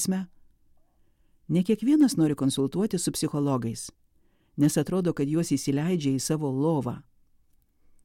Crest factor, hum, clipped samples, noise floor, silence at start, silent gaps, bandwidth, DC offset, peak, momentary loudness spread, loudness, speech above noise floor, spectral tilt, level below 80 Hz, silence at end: 16 dB; none; under 0.1%; -64 dBFS; 0 s; none; 16.5 kHz; under 0.1%; -12 dBFS; 12 LU; -26 LUFS; 39 dB; -6 dB/octave; -60 dBFS; 1.05 s